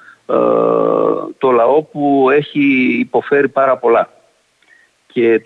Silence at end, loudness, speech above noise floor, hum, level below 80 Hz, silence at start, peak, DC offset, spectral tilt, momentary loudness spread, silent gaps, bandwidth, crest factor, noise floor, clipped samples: 0.05 s; -14 LUFS; 42 dB; none; -62 dBFS; 0.3 s; -2 dBFS; under 0.1%; -8 dB/octave; 5 LU; none; 4.4 kHz; 12 dB; -55 dBFS; under 0.1%